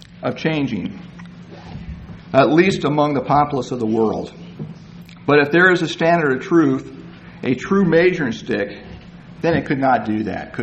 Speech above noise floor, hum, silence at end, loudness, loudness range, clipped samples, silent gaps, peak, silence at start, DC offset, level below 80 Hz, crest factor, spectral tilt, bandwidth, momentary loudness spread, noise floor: 22 dB; none; 0 s; -18 LUFS; 3 LU; under 0.1%; none; 0 dBFS; 0 s; under 0.1%; -46 dBFS; 18 dB; -6.5 dB/octave; 8.4 kHz; 22 LU; -39 dBFS